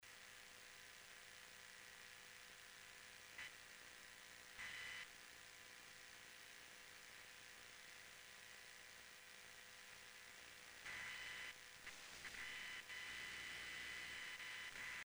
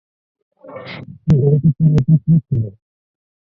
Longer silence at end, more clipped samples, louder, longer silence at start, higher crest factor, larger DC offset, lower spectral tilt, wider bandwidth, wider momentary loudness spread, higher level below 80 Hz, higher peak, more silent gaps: second, 0 s vs 0.8 s; neither; second, -55 LUFS vs -15 LUFS; second, 0 s vs 0.65 s; about the same, 16 dB vs 14 dB; neither; second, 0 dB/octave vs -10.5 dB/octave; first, over 20 kHz vs 5.2 kHz; second, 9 LU vs 19 LU; second, -80 dBFS vs -40 dBFS; second, -40 dBFS vs -2 dBFS; neither